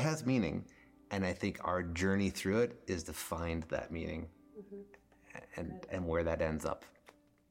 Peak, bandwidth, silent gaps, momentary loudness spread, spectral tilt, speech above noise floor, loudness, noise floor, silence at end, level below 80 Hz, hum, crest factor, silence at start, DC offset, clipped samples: -20 dBFS; 16.5 kHz; none; 18 LU; -6 dB/octave; 28 dB; -37 LUFS; -64 dBFS; 0.6 s; -54 dBFS; none; 18 dB; 0 s; under 0.1%; under 0.1%